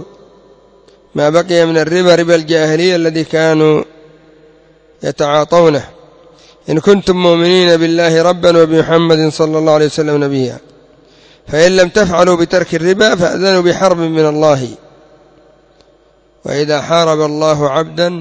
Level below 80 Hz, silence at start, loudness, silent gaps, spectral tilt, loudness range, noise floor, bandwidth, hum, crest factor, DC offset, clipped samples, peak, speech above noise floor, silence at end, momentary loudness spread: -46 dBFS; 0 s; -11 LUFS; none; -5.5 dB/octave; 6 LU; -49 dBFS; 8 kHz; none; 12 dB; under 0.1%; 0.3%; 0 dBFS; 39 dB; 0 s; 8 LU